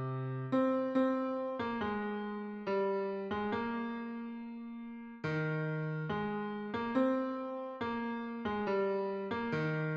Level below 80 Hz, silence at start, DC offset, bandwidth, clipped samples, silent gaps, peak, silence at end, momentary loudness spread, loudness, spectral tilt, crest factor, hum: -68 dBFS; 0 s; under 0.1%; 6.8 kHz; under 0.1%; none; -20 dBFS; 0 s; 10 LU; -36 LUFS; -8.5 dB/octave; 16 dB; none